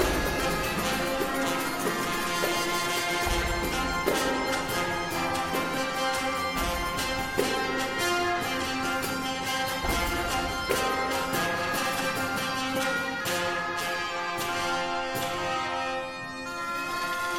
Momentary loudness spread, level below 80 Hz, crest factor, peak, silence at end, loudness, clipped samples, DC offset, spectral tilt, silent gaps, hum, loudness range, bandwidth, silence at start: 3 LU; -42 dBFS; 18 dB; -10 dBFS; 0 s; -28 LUFS; under 0.1%; under 0.1%; -3 dB/octave; none; none; 2 LU; 16.5 kHz; 0 s